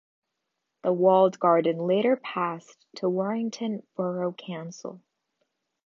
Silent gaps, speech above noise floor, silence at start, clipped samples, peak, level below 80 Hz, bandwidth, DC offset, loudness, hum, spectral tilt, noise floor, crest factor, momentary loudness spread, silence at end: none; 56 dB; 0.85 s; under 0.1%; -8 dBFS; -84 dBFS; 7.4 kHz; under 0.1%; -25 LUFS; none; -6.5 dB/octave; -82 dBFS; 20 dB; 17 LU; 0.9 s